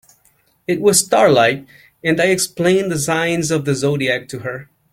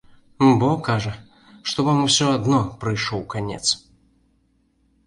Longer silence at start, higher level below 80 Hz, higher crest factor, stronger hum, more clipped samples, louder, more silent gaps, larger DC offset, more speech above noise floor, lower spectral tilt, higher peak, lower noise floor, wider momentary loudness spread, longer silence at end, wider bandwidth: first, 0.7 s vs 0.4 s; about the same, -54 dBFS vs -50 dBFS; about the same, 18 dB vs 18 dB; neither; neither; first, -16 LUFS vs -21 LUFS; neither; neither; about the same, 42 dB vs 44 dB; about the same, -4 dB/octave vs -4.5 dB/octave; first, 0 dBFS vs -4 dBFS; second, -58 dBFS vs -64 dBFS; first, 15 LU vs 11 LU; second, 0.3 s vs 1.3 s; first, 16.5 kHz vs 11.5 kHz